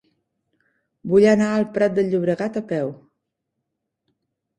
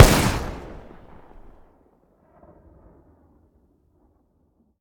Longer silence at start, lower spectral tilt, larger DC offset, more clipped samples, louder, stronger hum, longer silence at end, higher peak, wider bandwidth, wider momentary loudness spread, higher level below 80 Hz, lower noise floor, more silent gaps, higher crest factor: first, 1.05 s vs 0 s; first, -7 dB/octave vs -4.5 dB/octave; neither; second, under 0.1% vs 0.1%; about the same, -20 LUFS vs -21 LUFS; neither; second, 1.65 s vs 4.05 s; second, -4 dBFS vs 0 dBFS; second, 9.6 kHz vs over 20 kHz; second, 11 LU vs 30 LU; second, -62 dBFS vs -32 dBFS; first, -79 dBFS vs -65 dBFS; neither; second, 18 dB vs 24 dB